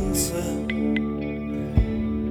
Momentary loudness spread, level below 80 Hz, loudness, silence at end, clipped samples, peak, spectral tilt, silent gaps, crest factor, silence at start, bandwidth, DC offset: 5 LU; -32 dBFS; -26 LUFS; 0 s; under 0.1%; -6 dBFS; -5.5 dB/octave; none; 18 dB; 0 s; over 20 kHz; under 0.1%